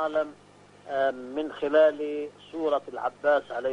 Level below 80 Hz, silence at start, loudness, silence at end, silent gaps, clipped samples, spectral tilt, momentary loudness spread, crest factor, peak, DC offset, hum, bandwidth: -70 dBFS; 0 s; -27 LUFS; 0 s; none; under 0.1%; -5 dB/octave; 12 LU; 18 dB; -10 dBFS; under 0.1%; 50 Hz at -60 dBFS; 8.8 kHz